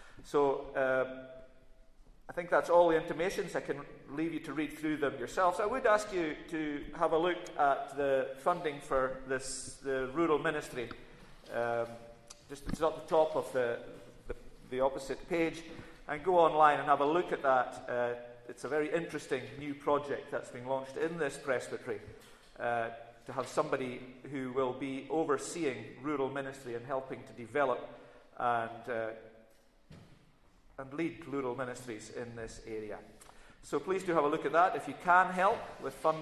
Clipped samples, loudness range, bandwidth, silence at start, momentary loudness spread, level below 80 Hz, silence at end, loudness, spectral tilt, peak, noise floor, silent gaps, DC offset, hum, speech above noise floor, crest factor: under 0.1%; 9 LU; 13.5 kHz; 0 s; 15 LU; -60 dBFS; 0 s; -34 LUFS; -5 dB/octave; -12 dBFS; -63 dBFS; none; under 0.1%; none; 30 dB; 22 dB